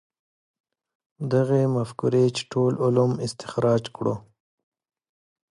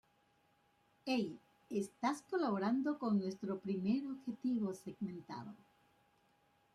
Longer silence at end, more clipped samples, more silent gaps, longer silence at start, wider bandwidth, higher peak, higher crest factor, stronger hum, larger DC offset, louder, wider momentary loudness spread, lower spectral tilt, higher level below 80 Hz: about the same, 1.3 s vs 1.2 s; neither; neither; first, 1.2 s vs 1.05 s; about the same, 11.5 kHz vs 12.5 kHz; first, -8 dBFS vs -22 dBFS; about the same, 18 dB vs 18 dB; neither; neither; first, -23 LUFS vs -39 LUFS; second, 8 LU vs 13 LU; about the same, -7 dB/octave vs -6.5 dB/octave; first, -64 dBFS vs -82 dBFS